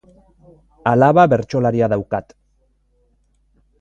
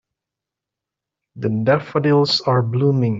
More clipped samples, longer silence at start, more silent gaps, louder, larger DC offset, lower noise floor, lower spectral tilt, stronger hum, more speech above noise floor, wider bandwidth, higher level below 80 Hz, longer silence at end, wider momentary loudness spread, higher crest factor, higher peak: neither; second, 0.85 s vs 1.35 s; neither; about the same, -16 LUFS vs -18 LUFS; neither; second, -61 dBFS vs -85 dBFS; first, -8.5 dB/octave vs -7 dB/octave; neither; second, 45 dB vs 68 dB; about the same, 7.6 kHz vs 7.6 kHz; first, -50 dBFS vs -60 dBFS; first, 1.6 s vs 0 s; first, 13 LU vs 6 LU; about the same, 18 dB vs 16 dB; first, 0 dBFS vs -4 dBFS